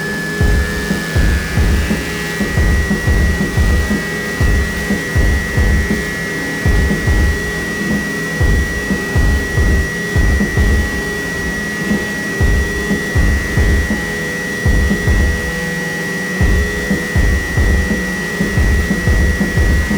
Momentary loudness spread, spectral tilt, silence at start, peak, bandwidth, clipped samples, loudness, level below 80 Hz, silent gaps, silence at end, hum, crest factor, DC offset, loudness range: 4 LU; -5.5 dB/octave; 0 s; -2 dBFS; over 20 kHz; under 0.1%; -16 LUFS; -18 dBFS; none; 0 s; none; 14 dB; under 0.1%; 1 LU